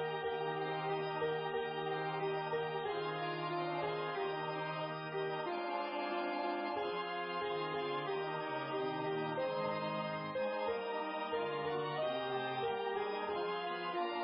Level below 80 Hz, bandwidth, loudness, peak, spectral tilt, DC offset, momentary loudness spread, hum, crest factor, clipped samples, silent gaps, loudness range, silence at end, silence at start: -78 dBFS; 5.4 kHz; -39 LUFS; -26 dBFS; -3 dB/octave; under 0.1%; 2 LU; none; 14 dB; under 0.1%; none; 1 LU; 0 s; 0 s